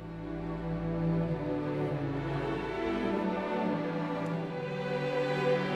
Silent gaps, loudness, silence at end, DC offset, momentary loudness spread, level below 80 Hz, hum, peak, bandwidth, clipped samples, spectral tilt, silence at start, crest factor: none; -33 LUFS; 0 s; under 0.1%; 5 LU; -50 dBFS; none; -18 dBFS; 9.2 kHz; under 0.1%; -8 dB/octave; 0 s; 14 dB